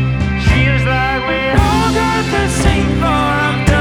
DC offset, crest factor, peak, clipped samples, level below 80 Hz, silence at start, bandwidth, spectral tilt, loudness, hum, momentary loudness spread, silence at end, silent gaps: under 0.1%; 12 dB; 0 dBFS; under 0.1%; -20 dBFS; 0 s; 14.5 kHz; -5.5 dB/octave; -14 LUFS; none; 3 LU; 0 s; none